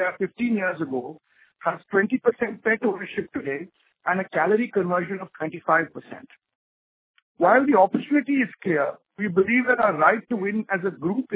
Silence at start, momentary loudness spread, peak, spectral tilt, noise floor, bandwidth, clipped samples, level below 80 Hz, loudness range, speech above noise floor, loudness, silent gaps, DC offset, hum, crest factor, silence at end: 0 s; 13 LU; -4 dBFS; -10 dB/octave; under -90 dBFS; 4 kHz; under 0.1%; -68 dBFS; 5 LU; over 67 dB; -23 LUFS; 6.55-7.14 s, 7.22-7.35 s; under 0.1%; none; 20 dB; 0 s